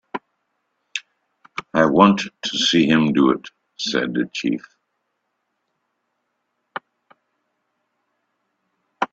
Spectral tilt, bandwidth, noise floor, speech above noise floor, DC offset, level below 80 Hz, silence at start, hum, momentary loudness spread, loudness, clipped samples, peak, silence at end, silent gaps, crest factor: -4.5 dB/octave; 8 kHz; -74 dBFS; 56 dB; under 0.1%; -62 dBFS; 0.15 s; none; 20 LU; -19 LUFS; under 0.1%; 0 dBFS; 0.05 s; none; 22 dB